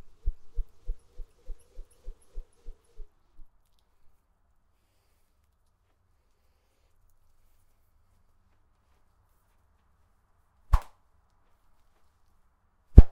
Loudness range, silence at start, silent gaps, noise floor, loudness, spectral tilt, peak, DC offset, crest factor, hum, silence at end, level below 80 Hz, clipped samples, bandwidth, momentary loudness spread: 16 LU; 0.25 s; none; -69 dBFS; -26 LUFS; -9.5 dB/octave; 0 dBFS; under 0.1%; 28 dB; none; 0 s; -32 dBFS; under 0.1%; 5.2 kHz; 31 LU